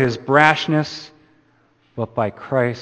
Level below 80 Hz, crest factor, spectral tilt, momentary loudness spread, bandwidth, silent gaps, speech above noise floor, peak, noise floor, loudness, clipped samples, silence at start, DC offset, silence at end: -56 dBFS; 20 dB; -6 dB/octave; 17 LU; 9 kHz; none; 40 dB; 0 dBFS; -59 dBFS; -18 LUFS; under 0.1%; 0 s; under 0.1%; 0 s